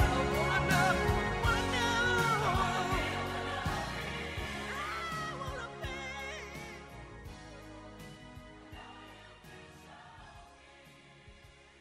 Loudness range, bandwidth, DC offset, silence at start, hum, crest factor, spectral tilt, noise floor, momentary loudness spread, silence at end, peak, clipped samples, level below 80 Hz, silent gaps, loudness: 21 LU; 16 kHz; under 0.1%; 0 s; none; 20 dB; -4.5 dB/octave; -57 dBFS; 23 LU; 0.2 s; -16 dBFS; under 0.1%; -46 dBFS; none; -33 LUFS